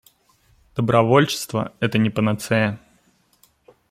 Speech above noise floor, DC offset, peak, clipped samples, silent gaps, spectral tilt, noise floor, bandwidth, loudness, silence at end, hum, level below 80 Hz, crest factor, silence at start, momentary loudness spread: 41 dB; under 0.1%; -2 dBFS; under 0.1%; none; -6 dB/octave; -61 dBFS; 16 kHz; -20 LUFS; 1.15 s; none; -56 dBFS; 20 dB; 0.75 s; 10 LU